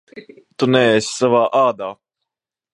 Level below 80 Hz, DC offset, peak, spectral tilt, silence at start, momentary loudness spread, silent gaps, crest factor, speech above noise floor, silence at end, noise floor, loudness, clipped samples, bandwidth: -64 dBFS; under 0.1%; 0 dBFS; -4.5 dB/octave; 0.15 s; 11 LU; none; 18 dB; 67 dB; 0.85 s; -82 dBFS; -16 LUFS; under 0.1%; 11.5 kHz